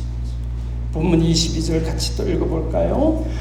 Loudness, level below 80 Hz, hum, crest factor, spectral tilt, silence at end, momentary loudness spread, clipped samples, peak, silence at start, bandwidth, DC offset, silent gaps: -20 LUFS; -24 dBFS; none; 16 dB; -6 dB/octave; 0 s; 10 LU; under 0.1%; -4 dBFS; 0 s; 13 kHz; under 0.1%; none